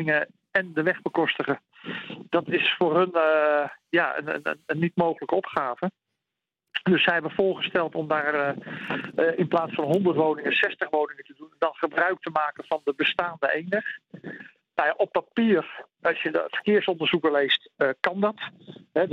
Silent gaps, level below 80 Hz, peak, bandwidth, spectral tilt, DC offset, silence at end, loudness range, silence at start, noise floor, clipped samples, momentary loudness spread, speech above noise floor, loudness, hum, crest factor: none; -72 dBFS; -6 dBFS; 7.6 kHz; -7 dB/octave; under 0.1%; 0 s; 3 LU; 0 s; -86 dBFS; under 0.1%; 10 LU; 61 dB; -25 LUFS; none; 20 dB